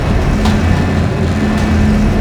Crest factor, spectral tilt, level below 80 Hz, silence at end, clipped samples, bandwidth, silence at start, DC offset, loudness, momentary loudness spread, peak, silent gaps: 12 dB; -7 dB/octave; -18 dBFS; 0 s; under 0.1%; 12.5 kHz; 0 s; under 0.1%; -13 LUFS; 2 LU; 0 dBFS; none